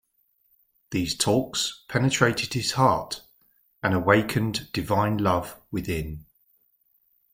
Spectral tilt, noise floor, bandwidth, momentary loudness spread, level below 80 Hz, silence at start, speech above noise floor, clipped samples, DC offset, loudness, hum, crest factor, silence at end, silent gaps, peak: -4.5 dB/octave; -69 dBFS; 16.5 kHz; 12 LU; -50 dBFS; 0.9 s; 44 dB; under 0.1%; under 0.1%; -25 LUFS; none; 24 dB; 1.1 s; none; -4 dBFS